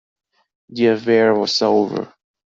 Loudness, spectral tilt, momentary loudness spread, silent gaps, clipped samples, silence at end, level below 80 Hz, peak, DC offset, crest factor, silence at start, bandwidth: -17 LUFS; -5 dB/octave; 15 LU; none; under 0.1%; 0.45 s; -64 dBFS; -2 dBFS; under 0.1%; 16 dB; 0.7 s; 7.8 kHz